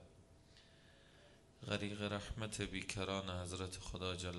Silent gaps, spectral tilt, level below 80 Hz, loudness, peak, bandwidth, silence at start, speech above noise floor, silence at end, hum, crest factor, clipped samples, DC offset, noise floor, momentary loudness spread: none; -4.5 dB/octave; -60 dBFS; -44 LUFS; -22 dBFS; 11.5 kHz; 0 s; 22 dB; 0 s; none; 24 dB; under 0.1%; under 0.1%; -65 dBFS; 23 LU